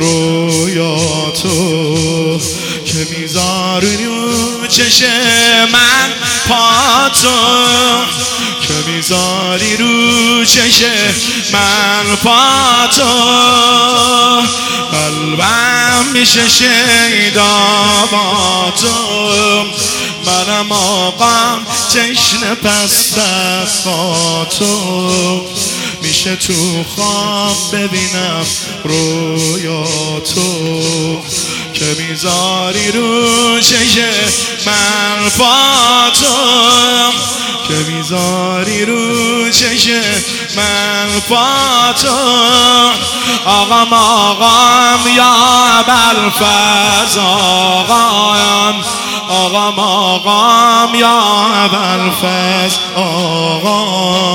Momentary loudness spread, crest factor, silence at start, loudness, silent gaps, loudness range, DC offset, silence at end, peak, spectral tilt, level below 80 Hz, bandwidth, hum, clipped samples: 8 LU; 10 dB; 0 s; -9 LUFS; none; 6 LU; under 0.1%; 0 s; 0 dBFS; -2 dB/octave; -46 dBFS; over 20 kHz; none; 0.2%